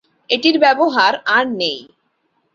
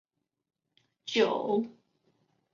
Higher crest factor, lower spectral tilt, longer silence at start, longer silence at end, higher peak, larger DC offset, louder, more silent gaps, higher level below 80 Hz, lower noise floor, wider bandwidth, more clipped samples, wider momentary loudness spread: second, 16 dB vs 22 dB; about the same, -3.5 dB/octave vs -4.5 dB/octave; second, 0.3 s vs 1.05 s; about the same, 0.7 s vs 0.8 s; first, 0 dBFS vs -12 dBFS; neither; first, -15 LUFS vs -29 LUFS; neither; first, -64 dBFS vs -80 dBFS; second, -66 dBFS vs -73 dBFS; about the same, 7.4 kHz vs 7.4 kHz; neither; second, 8 LU vs 15 LU